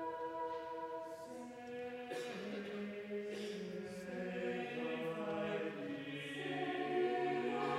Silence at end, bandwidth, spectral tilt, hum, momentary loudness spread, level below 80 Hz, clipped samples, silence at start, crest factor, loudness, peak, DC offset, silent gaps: 0 s; 15 kHz; -5.5 dB/octave; none; 9 LU; -82 dBFS; under 0.1%; 0 s; 16 dB; -43 LUFS; -26 dBFS; under 0.1%; none